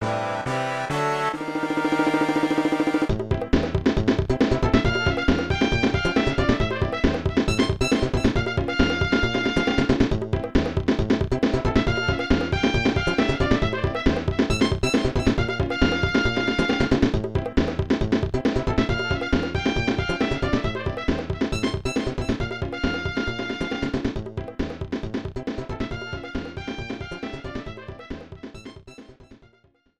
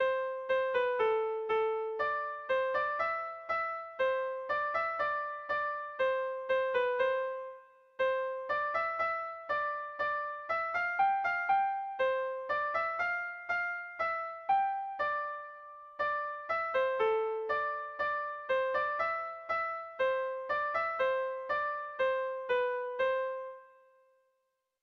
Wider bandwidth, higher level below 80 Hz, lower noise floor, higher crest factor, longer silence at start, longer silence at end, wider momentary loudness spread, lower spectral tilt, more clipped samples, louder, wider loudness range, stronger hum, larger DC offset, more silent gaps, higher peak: first, 12.5 kHz vs 6.4 kHz; first, -34 dBFS vs -72 dBFS; second, -61 dBFS vs -81 dBFS; about the same, 18 dB vs 14 dB; about the same, 0 s vs 0 s; second, 0.65 s vs 1.15 s; first, 10 LU vs 6 LU; first, -6 dB/octave vs -3.5 dB/octave; neither; first, -24 LUFS vs -33 LUFS; first, 9 LU vs 2 LU; neither; first, 0.2% vs under 0.1%; neither; first, -4 dBFS vs -20 dBFS